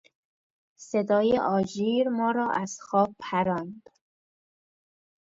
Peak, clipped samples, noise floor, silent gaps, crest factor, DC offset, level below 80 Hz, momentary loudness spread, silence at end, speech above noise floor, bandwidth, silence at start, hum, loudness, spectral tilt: -10 dBFS; under 0.1%; under -90 dBFS; none; 18 dB; under 0.1%; -66 dBFS; 8 LU; 1.5 s; over 64 dB; 8 kHz; 0.8 s; none; -26 LUFS; -6 dB/octave